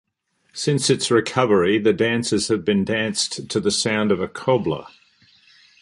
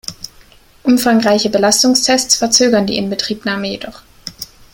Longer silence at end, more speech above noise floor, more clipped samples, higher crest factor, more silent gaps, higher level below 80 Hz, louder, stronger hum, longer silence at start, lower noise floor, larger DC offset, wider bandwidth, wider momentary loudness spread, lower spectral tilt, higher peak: first, 0.95 s vs 0.3 s; first, 46 dB vs 31 dB; neither; about the same, 18 dB vs 16 dB; neither; second, -54 dBFS vs -48 dBFS; second, -20 LUFS vs -13 LUFS; neither; first, 0.55 s vs 0.1 s; first, -66 dBFS vs -45 dBFS; neither; second, 11.5 kHz vs 17 kHz; second, 6 LU vs 21 LU; first, -4 dB/octave vs -2.5 dB/octave; about the same, -2 dBFS vs 0 dBFS